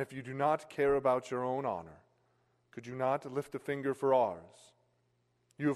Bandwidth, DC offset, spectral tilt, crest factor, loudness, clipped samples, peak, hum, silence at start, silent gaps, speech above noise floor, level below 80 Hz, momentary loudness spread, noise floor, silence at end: 13 kHz; under 0.1%; -7 dB/octave; 18 dB; -33 LUFS; under 0.1%; -16 dBFS; none; 0 s; none; 42 dB; -68 dBFS; 14 LU; -76 dBFS; 0 s